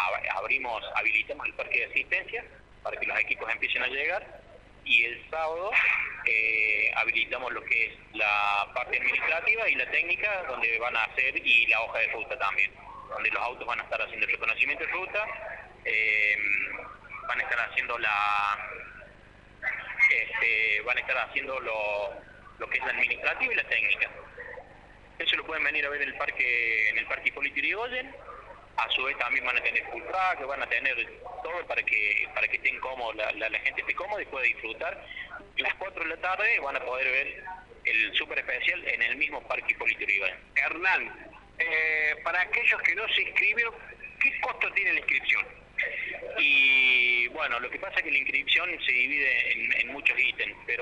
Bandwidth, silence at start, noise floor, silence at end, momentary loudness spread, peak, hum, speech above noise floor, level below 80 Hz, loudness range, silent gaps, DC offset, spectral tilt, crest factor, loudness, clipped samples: 10.5 kHz; 0 s; -53 dBFS; 0 s; 11 LU; -10 dBFS; 50 Hz at -60 dBFS; 24 dB; -58 dBFS; 5 LU; none; under 0.1%; -2.5 dB/octave; 18 dB; -26 LUFS; under 0.1%